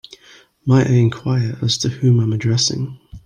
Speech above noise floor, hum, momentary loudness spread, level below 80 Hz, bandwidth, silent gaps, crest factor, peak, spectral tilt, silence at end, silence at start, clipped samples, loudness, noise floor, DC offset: 32 dB; none; 9 LU; -50 dBFS; 9.8 kHz; none; 16 dB; -2 dBFS; -5.5 dB/octave; 0.05 s; 0.65 s; under 0.1%; -17 LUFS; -48 dBFS; under 0.1%